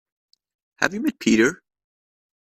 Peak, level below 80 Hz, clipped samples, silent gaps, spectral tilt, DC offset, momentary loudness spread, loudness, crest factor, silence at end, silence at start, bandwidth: 0 dBFS; -62 dBFS; under 0.1%; none; -4 dB/octave; under 0.1%; 7 LU; -21 LUFS; 24 dB; 0.85 s; 0.8 s; 14.5 kHz